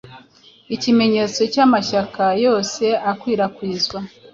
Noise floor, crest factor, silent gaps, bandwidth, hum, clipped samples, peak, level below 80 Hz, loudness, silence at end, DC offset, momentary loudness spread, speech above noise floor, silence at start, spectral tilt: -49 dBFS; 16 dB; none; 7.6 kHz; none; under 0.1%; -2 dBFS; -58 dBFS; -18 LUFS; 0.25 s; under 0.1%; 7 LU; 31 dB; 0.05 s; -4.5 dB/octave